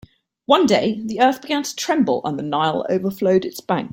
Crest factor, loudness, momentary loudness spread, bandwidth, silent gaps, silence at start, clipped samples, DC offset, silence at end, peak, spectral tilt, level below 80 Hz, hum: 18 dB; -19 LUFS; 7 LU; 17 kHz; none; 0.5 s; under 0.1%; under 0.1%; 0 s; -2 dBFS; -5 dB/octave; -60 dBFS; none